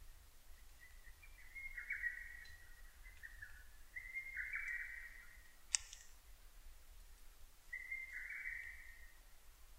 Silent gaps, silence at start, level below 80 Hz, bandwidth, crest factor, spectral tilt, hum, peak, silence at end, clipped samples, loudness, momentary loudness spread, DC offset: none; 0 s; -60 dBFS; 16 kHz; 40 dB; 1 dB/octave; none; -10 dBFS; 0 s; under 0.1%; -47 LUFS; 22 LU; under 0.1%